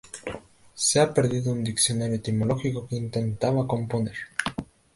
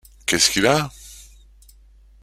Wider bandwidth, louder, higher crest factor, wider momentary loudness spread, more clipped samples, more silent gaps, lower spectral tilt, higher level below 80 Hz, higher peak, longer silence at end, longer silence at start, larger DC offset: second, 11.5 kHz vs 16 kHz; second, -25 LUFS vs -18 LUFS; about the same, 18 dB vs 22 dB; second, 14 LU vs 25 LU; neither; neither; first, -4.5 dB/octave vs -2.5 dB/octave; second, -54 dBFS vs -46 dBFS; second, -8 dBFS vs -2 dBFS; second, 0.3 s vs 1 s; second, 0.05 s vs 0.3 s; neither